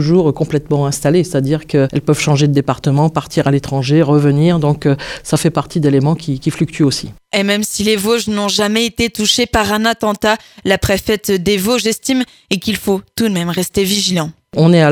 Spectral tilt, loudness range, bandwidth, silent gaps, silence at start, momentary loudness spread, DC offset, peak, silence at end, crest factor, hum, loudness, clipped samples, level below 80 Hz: -5 dB/octave; 2 LU; 18.5 kHz; none; 0 s; 6 LU; under 0.1%; 0 dBFS; 0 s; 14 dB; none; -14 LUFS; under 0.1%; -40 dBFS